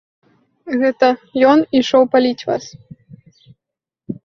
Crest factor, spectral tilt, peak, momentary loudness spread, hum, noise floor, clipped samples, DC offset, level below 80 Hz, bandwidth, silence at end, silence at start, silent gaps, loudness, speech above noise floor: 16 dB; -5 dB/octave; 0 dBFS; 11 LU; none; -85 dBFS; under 0.1%; under 0.1%; -60 dBFS; 7.2 kHz; 0.1 s; 0.65 s; none; -15 LUFS; 70 dB